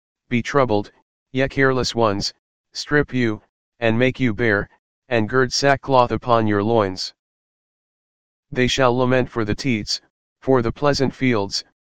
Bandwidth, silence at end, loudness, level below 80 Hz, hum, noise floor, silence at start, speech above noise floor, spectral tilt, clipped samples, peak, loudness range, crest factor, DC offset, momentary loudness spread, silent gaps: 15.5 kHz; 0.1 s; -20 LUFS; -44 dBFS; none; under -90 dBFS; 0.15 s; over 71 dB; -5 dB/octave; under 0.1%; 0 dBFS; 3 LU; 20 dB; 2%; 10 LU; 1.02-1.26 s, 2.39-2.64 s, 3.49-3.72 s, 4.79-5.02 s, 7.19-8.43 s, 10.10-10.36 s